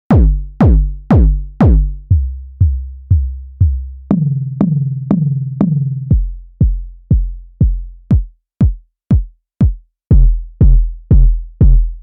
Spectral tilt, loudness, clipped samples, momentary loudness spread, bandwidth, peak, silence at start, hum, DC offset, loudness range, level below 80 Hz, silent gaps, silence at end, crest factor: -12 dB/octave; -15 LUFS; under 0.1%; 9 LU; 2.7 kHz; 0 dBFS; 0.1 s; none; under 0.1%; 3 LU; -14 dBFS; none; 0 s; 12 dB